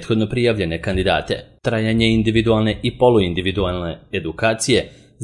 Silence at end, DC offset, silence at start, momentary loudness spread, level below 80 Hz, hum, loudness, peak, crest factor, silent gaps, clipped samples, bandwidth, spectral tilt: 0 s; under 0.1%; 0 s; 10 LU; -38 dBFS; none; -19 LUFS; -2 dBFS; 16 dB; none; under 0.1%; 11.5 kHz; -5.5 dB/octave